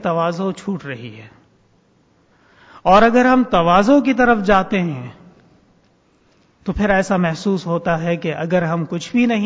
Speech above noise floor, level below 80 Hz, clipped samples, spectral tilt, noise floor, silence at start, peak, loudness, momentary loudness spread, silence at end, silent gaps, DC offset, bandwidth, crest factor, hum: 41 dB; -42 dBFS; under 0.1%; -6.5 dB/octave; -57 dBFS; 0 s; -2 dBFS; -16 LUFS; 15 LU; 0 s; none; under 0.1%; 8 kHz; 16 dB; none